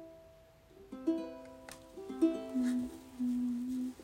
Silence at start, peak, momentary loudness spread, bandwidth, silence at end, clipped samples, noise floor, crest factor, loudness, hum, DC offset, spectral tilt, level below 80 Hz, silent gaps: 0 s; -20 dBFS; 18 LU; 16 kHz; 0 s; under 0.1%; -60 dBFS; 18 dB; -37 LUFS; none; under 0.1%; -5.5 dB/octave; -66 dBFS; none